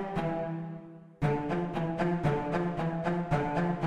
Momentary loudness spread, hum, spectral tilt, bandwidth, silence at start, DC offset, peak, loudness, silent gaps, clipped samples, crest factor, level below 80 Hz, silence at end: 9 LU; none; -8.5 dB/octave; 9 kHz; 0 s; under 0.1%; -16 dBFS; -31 LUFS; none; under 0.1%; 16 dB; -50 dBFS; 0 s